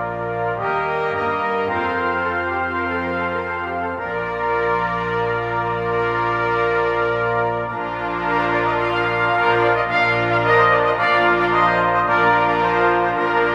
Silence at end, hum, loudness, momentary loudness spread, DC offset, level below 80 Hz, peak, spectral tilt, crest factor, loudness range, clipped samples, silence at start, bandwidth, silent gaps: 0 s; none; -19 LUFS; 8 LU; under 0.1%; -46 dBFS; -2 dBFS; -6.5 dB/octave; 16 dB; 6 LU; under 0.1%; 0 s; 8.6 kHz; none